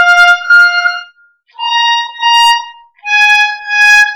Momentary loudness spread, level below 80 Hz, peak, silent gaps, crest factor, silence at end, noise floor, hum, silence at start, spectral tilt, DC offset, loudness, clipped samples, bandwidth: 10 LU; -52 dBFS; 0 dBFS; none; 10 dB; 0 s; -46 dBFS; none; 0 s; 5 dB/octave; under 0.1%; -7 LUFS; under 0.1%; over 20 kHz